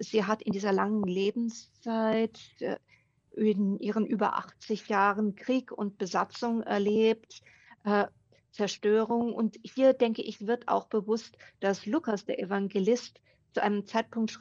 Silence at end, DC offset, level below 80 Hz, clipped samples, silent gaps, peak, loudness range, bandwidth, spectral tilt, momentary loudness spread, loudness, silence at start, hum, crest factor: 0.05 s; under 0.1%; -76 dBFS; under 0.1%; none; -12 dBFS; 2 LU; 7.4 kHz; -6 dB/octave; 10 LU; -30 LUFS; 0 s; none; 18 dB